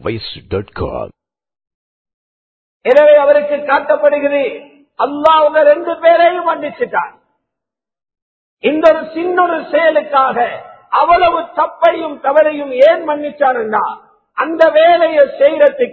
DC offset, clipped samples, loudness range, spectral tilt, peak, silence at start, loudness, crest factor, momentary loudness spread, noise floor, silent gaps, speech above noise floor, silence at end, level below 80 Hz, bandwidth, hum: under 0.1%; 0.2%; 4 LU; -6.5 dB/octave; 0 dBFS; 0.05 s; -12 LUFS; 12 dB; 13 LU; -83 dBFS; 1.74-2.05 s, 2.14-2.80 s, 8.22-8.57 s; 71 dB; 0 s; -46 dBFS; 5.2 kHz; none